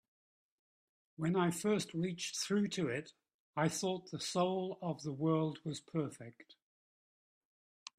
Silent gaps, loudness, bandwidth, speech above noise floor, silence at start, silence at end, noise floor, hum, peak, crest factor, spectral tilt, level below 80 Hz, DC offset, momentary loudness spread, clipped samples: 3.34-3.53 s; -37 LUFS; 15 kHz; over 53 dB; 1.2 s; 1.7 s; under -90 dBFS; none; -20 dBFS; 18 dB; -5 dB/octave; -78 dBFS; under 0.1%; 10 LU; under 0.1%